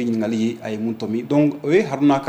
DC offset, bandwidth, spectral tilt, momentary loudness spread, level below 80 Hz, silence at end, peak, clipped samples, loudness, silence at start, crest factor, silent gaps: under 0.1%; 16 kHz; -7 dB/octave; 8 LU; -62 dBFS; 0 s; -6 dBFS; under 0.1%; -20 LUFS; 0 s; 14 dB; none